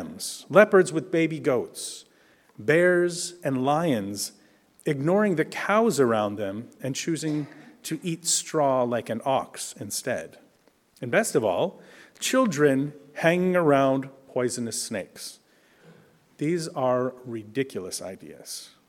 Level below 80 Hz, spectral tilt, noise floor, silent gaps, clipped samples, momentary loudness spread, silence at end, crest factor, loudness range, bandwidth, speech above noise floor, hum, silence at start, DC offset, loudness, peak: -72 dBFS; -4.5 dB/octave; -62 dBFS; none; under 0.1%; 14 LU; 0.25 s; 24 dB; 6 LU; 18 kHz; 38 dB; none; 0 s; under 0.1%; -25 LUFS; -2 dBFS